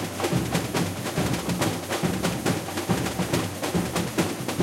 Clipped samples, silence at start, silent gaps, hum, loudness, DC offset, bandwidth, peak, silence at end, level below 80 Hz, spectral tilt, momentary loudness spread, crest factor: under 0.1%; 0 s; none; none; -26 LUFS; under 0.1%; 16.5 kHz; -10 dBFS; 0 s; -46 dBFS; -4.5 dB/octave; 2 LU; 18 dB